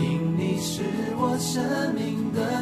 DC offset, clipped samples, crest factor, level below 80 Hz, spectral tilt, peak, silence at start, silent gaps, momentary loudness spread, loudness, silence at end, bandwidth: under 0.1%; under 0.1%; 14 dB; -58 dBFS; -5.5 dB/octave; -12 dBFS; 0 s; none; 3 LU; -26 LUFS; 0 s; 14 kHz